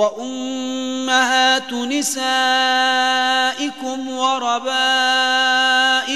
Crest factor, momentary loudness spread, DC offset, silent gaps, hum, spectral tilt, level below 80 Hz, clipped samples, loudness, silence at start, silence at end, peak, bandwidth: 16 dB; 10 LU; 0.4%; none; none; 0 dB/octave; -76 dBFS; under 0.1%; -17 LUFS; 0 s; 0 s; -2 dBFS; 13 kHz